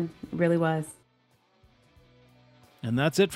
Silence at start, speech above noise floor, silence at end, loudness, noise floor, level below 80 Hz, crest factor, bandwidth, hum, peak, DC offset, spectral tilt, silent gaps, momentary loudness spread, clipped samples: 0 s; 42 dB; 0 s; -27 LUFS; -67 dBFS; -64 dBFS; 18 dB; 16 kHz; none; -10 dBFS; under 0.1%; -6 dB/octave; none; 13 LU; under 0.1%